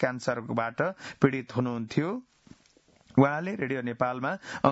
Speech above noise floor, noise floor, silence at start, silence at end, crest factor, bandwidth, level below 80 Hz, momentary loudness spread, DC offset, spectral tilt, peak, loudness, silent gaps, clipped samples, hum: 34 dB; -62 dBFS; 0 s; 0 s; 24 dB; 8 kHz; -66 dBFS; 8 LU; under 0.1%; -7 dB/octave; -6 dBFS; -29 LUFS; none; under 0.1%; none